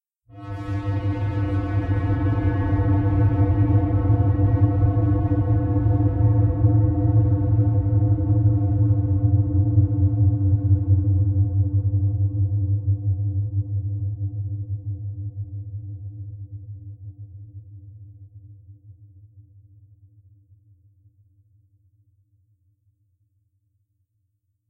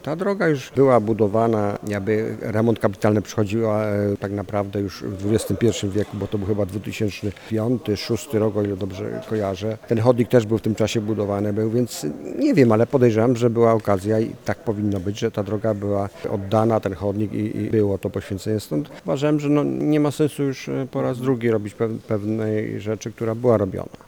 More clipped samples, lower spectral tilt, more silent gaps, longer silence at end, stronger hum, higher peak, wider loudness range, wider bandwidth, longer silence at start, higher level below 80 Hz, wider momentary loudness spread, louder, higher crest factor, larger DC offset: neither; first, -12 dB/octave vs -7 dB/octave; neither; first, 5.3 s vs 0.2 s; neither; second, -6 dBFS vs 0 dBFS; first, 16 LU vs 5 LU; second, 3 kHz vs 19 kHz; first, 0.35 s vs 0.05 s; first, -36 dBFS vs -54 dBFS; first, 17 LU vs 9 LU; about the same, -21 LUFS vs -22 LUFS; about the same, 16 dB vs 20 dB; neither